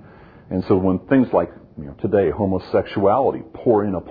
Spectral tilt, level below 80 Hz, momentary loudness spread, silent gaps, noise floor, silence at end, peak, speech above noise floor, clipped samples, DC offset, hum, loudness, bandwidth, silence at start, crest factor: -11 dB/octave; -48 dBFS; 11 LU; none; -44 dBFS; 0 s; -4 dBFS; 25 dB; under 0.1%; under 0.1%; none; -20 LUFS; 5 kHz; 0.5 s; 16 dB